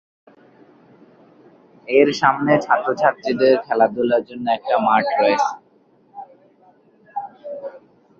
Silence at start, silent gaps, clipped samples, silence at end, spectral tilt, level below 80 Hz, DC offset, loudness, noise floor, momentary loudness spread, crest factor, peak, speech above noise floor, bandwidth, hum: 1.85 s; none; under 0.1%; 0.4 s; -5.5 dB/octave; -66 dBFS; under 0.1%; -18 LUFS; -56 dBFS; 20 LU; 20 dB; -2 dBFS; 39 dB; 7.6 kHz; none